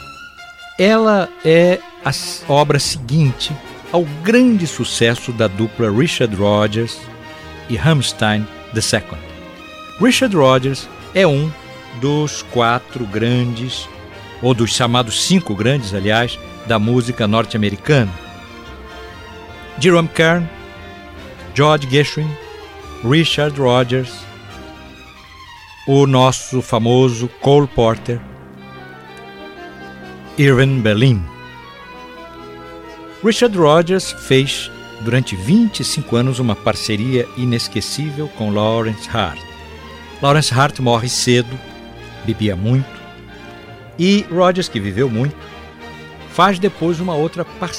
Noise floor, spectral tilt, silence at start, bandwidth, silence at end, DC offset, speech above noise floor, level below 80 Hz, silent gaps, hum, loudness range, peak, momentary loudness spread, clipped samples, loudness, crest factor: -38 dBFS; -5.5 dB/octave; 0 s; 15.5 kHz; 0 s; under 0.1%; 24 dB; -44 dBFS; none; none; 4 LU; 0 dBFS; 22 LU; under 0.1%; -16 LUFS; 16 dB